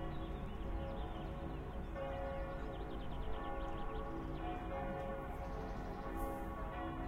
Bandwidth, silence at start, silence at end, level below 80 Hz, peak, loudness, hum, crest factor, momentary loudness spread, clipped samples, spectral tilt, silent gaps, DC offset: 16 kHz; 0 s; 0 s; -46 dBFS; -30 dBFS; -45 LUFS; none; 14 dB; 3 LU; under 0.1%; -7.5 dB/octave; none; under 0.1%